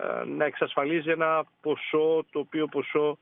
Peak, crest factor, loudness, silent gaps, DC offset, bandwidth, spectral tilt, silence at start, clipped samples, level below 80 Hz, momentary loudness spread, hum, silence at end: -10 dBFS; 16 dB; -27 LUFS; none; under 0.1%; 3.9 kHz; -3.5 dB/octave; 0 s; under 0.1%; -82 dBFS; 6 LU; none; 0.05 s